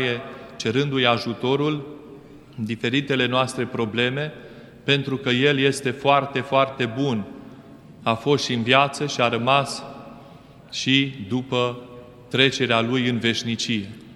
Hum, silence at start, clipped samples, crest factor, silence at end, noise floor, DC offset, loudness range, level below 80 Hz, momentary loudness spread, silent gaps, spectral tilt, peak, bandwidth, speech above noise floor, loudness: none; 0 s; under 0.1%; 22 dB; 0 s; -46 dBFS; under 0.1%; 2 LU; -60 dBFS; 14 LU; none; -5 dB/octave; 0 dBFS; 12.5 kHz; 24 dB; -22 LUFS